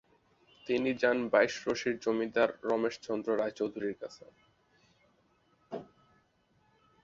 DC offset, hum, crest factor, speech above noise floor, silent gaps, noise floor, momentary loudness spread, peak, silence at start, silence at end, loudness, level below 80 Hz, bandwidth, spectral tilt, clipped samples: under 0.1%; none; 22 dB; 39 dB; none; -71 dBFS; 18 LU; -12 dBFS; 0.65 s; 1.2 s; -31 LUFS; -72 dBFS; 7.6 kHz; -4.5 dB/octave; under 0.1%